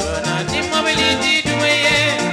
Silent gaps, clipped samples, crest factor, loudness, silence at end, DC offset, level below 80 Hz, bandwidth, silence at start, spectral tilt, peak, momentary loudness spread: none; under 0.1%; 12 dB; -15 LUFS; 0 s; under 0.1%; -40 dBFS; 16 kHz; 0 s; -3 dB/octave; -4 dBFS; 6 LU